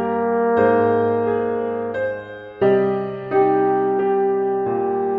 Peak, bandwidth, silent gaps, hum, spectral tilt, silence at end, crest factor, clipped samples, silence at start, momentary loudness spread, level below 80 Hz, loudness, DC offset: -4 dBFS; 4.1 kHz; none; none; -10 dB/octave; 0 s; 16 dB; under 0.1%; 0 s; 8 LU; -58 dBFS; -19 LUFS; under 0.1%